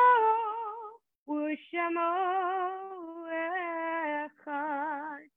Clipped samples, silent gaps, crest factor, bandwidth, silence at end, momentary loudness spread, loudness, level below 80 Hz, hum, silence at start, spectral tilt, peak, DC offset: under 0.1%; 1.15-1.26 s; 18 dB; 3.9 kHz; 0.15 s; 12 LU; -32 LUFS; -88 dBFS; none; 0 s; -6 dB/octave; -12 dBFS; under 0.1%